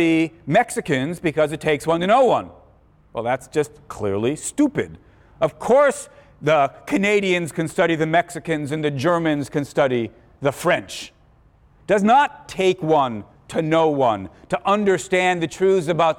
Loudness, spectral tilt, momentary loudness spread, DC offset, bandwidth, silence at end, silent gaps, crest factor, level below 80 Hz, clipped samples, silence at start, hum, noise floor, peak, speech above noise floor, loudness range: -20 LUFS; -5.5 dB/octave; 12 LU; under 0.1%; 16.5 kHz; 0.05 s; none; 14 dB; -54 dBFS; under 0.1%; 0 s; none; -54 dBFS; -6 dBFS; 34 dB; 3 LU